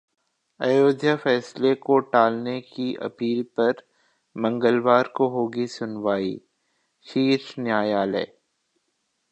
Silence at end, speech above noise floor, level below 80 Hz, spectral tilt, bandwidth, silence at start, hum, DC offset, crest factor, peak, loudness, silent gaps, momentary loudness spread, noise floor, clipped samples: 1.05 s; 52 dB; -72 dBFS; -6.5 dB/octave; 8.8 kHz; 0.6 s; none; under 0.1%; 20 dB; -4 dBFS; -23 LUFS; none; 10 LU; -74 dBFS; under 0.1%